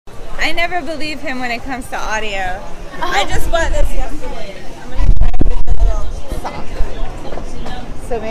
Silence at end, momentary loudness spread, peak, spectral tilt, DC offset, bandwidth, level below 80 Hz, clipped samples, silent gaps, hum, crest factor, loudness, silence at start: 0 s; 12 LU; 0 dBFS; -4.5 dB/octave; under 0.1%; 11 kHz; -18 dBFS; 0.4%; none; none; 10 dB; -21 LUFS; 0.05 s